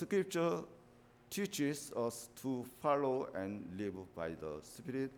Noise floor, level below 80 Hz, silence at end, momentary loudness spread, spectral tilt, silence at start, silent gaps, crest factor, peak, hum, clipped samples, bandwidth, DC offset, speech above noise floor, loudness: -64 dBFS; -74 dBFS; 0 s; 10 LU; -5 dB/octave; 0 s; none; 18 dB; -22 dBFS; none; under 0.1%; over 20 kHz; under 0.1%; 25 dB; -40 LUFS